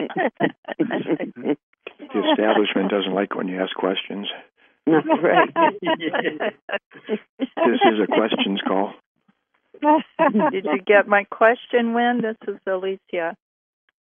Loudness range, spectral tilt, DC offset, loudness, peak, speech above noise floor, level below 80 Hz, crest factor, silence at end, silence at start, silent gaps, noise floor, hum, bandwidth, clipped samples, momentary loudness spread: 3 LU; -9 dB/octave; under 0.1%; -21 LUFS; -2 dBFS; 45 dB; -80 dBFS; 18 dB; 0.75 s; 0 s; 0.58-0.63 s, 1.63-1.73 s, 6.62-6.68 s, 6.86-6.90 s, 7.29-7.38 s, 9.06-9.15 s; -65 dBFS; none; 3.7 kHz; under 0.1%; 13 LU